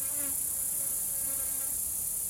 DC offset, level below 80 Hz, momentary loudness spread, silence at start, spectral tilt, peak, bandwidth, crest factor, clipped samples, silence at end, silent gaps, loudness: under 0.1%; -58 dBFS; 1 LU; 0 s; -0.5 dB/octave; -20 dBFS; 16.5 kHz; 14 dB; under 0.1%; 0 s; none; -29 LUFS